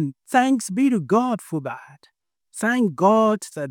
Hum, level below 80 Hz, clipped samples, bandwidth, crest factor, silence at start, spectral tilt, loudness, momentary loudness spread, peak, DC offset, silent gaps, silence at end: none; -72 dBFS; under 0.1%; 17 kHz; 16 dB; 0 s; -5.5 dB/octave; -21 LUFS; 12 LU; -4 dBFS; under 0.1%; none; 0 s